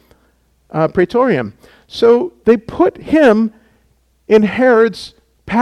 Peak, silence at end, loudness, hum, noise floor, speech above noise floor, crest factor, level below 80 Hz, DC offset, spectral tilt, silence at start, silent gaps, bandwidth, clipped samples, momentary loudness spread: 0 dBFS; 0 s; -13 LUFS; none; -57 dBFS; 44 dB; 14 dB; -46 dBFS; under 0.1%; -7 dB/octave; 0.75 s; none; 11 kHz; under 0.1%; 13 LU